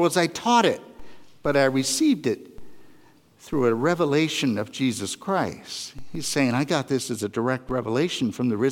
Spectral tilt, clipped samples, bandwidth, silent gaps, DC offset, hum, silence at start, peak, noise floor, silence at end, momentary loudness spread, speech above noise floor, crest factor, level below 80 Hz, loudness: -4.5 dB/octave; under 0.1%; 17 kHz; none; under 0.1%; none; 0 s; -6 dBFS; -54 dBFS; 0 s; 10 LU; 31 dB; 18 dB; -56 dBFS; -24 LUFS